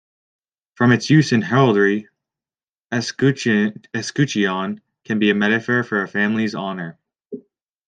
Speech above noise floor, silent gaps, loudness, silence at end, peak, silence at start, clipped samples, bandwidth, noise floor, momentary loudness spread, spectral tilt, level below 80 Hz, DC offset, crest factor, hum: over 72 dB; 2.69-2.73 s, 2.80-2.90 s; -19 LUFS; 0.5 s; -2 dBFS; 0.8 s; under 0.1%; 9.4 kHz; under -90 dBFS; 15 LU; -6 dB/octave; -64 dBFS; under 0.1%; 18 dB; none